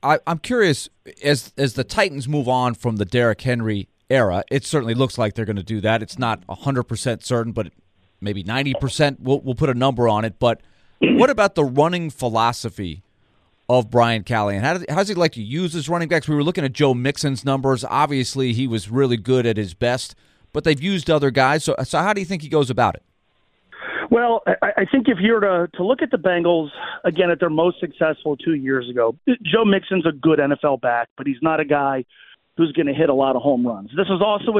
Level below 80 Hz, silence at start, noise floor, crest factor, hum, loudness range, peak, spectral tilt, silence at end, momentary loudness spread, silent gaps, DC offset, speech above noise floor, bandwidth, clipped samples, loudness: -50 dBFS; 0.05 s; -64 dBFS; 18 dB; none; 3 LU; -2 dBFS; -6 dB/octave; 0 s; 8 LU; 31.11-31.16 s; under 0.1%; 44 dB; 14.5 kHz; under 0.1%; -20 LUFS